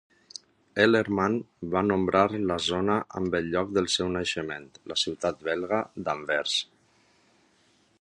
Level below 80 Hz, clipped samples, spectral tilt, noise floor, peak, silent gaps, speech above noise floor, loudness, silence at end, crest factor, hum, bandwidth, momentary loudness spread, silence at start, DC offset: -56 dBFS; under 0.1%; -4.5 dB/octave; -65 dBFS; -6 dBFS; none; 38 dB; -27 LUFS; 1.35 s; 22 dB; none; 11.5 kHz; 13 LU; 0.75 s; under 0.1%